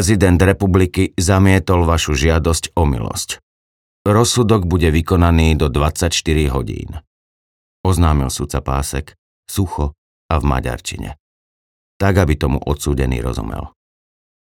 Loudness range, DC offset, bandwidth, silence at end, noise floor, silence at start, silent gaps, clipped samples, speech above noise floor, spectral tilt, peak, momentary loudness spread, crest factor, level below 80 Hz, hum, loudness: 6 LU; under 0.1%; 16.5 kHz; 0.75 s; under -90 dBFS; 0 s; 3.43-4.05 s, 7.07-7.84 s, 9.18-9.43 s, 9.98-10.29 s, 11.20-12.00 s; under 0.1%; over 75 dB; -5.5 dB/octave; 0 dBFS; 13 LU; 16 dB; -26 dBFS; none; -16 LUFS